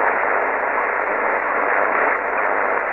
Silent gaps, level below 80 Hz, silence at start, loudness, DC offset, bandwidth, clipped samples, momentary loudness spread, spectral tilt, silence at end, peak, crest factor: none; -54 dBFS; 0 s; -19 LUFS; under 0.1%; 5.6 kHz; under 0.1%; 2 LU; -6.5 dB/octave; 0 s; -6 dBFS; 14 dB